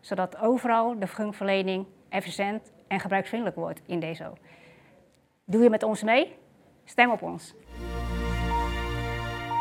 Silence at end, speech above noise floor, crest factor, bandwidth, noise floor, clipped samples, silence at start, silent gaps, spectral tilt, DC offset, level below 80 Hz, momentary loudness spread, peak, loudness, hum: 0 s; 36 dB; 24 dB; 16.5 kHz; -62 dBFS; under 0.1%; 0.05 s; none; -6 dB/octave; under 0.1%; -40 dBFS; 13 LU; -4 dBFS; -27 LUFS; none